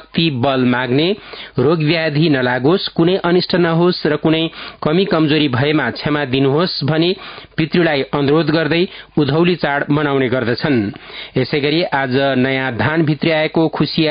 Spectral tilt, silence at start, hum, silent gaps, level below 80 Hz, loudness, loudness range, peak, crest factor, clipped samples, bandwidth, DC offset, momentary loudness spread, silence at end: -11.5 dB/octave; 0 s; none; none; -48 dBFS; -16 LUFS; 2 LU; -2 dBFS; 14 dB; under 0.1%; 5.2 kHz; under 0.1%; 5 LU; 0 s